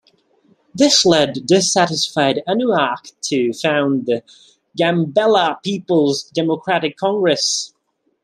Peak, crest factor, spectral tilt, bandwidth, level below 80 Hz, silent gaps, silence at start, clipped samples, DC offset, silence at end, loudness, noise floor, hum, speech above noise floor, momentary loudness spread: 0 dBFS; 18 dB; -3.5 dB/octave; 13.5 kHz; -60 dBFS; none; 0.75 s; under 0.1%; under 0.1%; 0.55 s; -17 LUFS; -57 dBFS; none; 41 dB; 9 LU